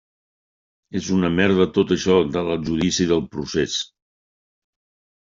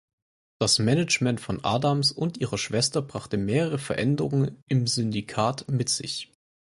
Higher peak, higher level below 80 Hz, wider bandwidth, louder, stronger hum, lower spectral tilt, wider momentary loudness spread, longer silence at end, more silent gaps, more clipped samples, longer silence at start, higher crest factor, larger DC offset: first, -2 dBFS vs -8 dBFS; first, -50 dBFS vs -56 dBFS; second, 7.6 kHz vs 11.5 kHz; first, -20 LUFS vs -25 LUFS; neither; about the same, -5 dB/octave vs -4.5 dB/octave; about the same, 9 LU vs 7 LU; first, 1.4 s vs 0.5 s; second, none vs 4.62-4.67 s; neither; first, 0.9 s vs 0.6 s; about the same, 20 dB vs 18 dB; neither